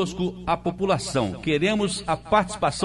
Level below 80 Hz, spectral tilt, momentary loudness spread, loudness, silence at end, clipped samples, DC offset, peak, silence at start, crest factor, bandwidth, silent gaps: -46 dBFS; -5 dB/octave; 5 LU; -24 LUFS; 0 s; under 0.1%; under 0.1%; -6 dBFS; 0 s; 18 dB; 11.5 kHz; none